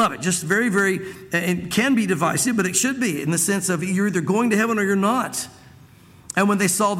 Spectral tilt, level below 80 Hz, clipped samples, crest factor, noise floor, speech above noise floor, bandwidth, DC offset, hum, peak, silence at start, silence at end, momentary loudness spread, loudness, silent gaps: -4 dB/octave; -58 dBFS; under 0.1%; 16 dB; -48 dBFS; 27 dB; 16.5 kHz; under 0.1%; none; -6 dBFS; 0 s; 0 s; 5 LU; -20 LUFS; none